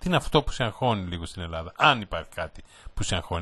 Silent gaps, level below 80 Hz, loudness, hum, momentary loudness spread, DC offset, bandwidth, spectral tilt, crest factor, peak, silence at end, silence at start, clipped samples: none; -40 dBFS; -26 LUFS; none; 14 LU; under 0.1%; 12.5 kHz; -4.5 dB/octave; 24 dB; -2 dBFS; 0 s; 0 s; under 0.1%